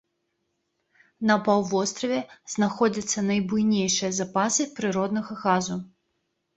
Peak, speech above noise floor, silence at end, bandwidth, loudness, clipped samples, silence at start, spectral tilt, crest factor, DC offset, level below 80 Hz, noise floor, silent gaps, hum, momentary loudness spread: -6 dBFS; 52 dB; 0.7 s; 8.4 kHz; -25 LUFS; under 0.1%; 1.2 s; -4 dB/octave; 20 dB; under 0.1%; -64 dBFS; -76 dBFS; none; none; 6 LU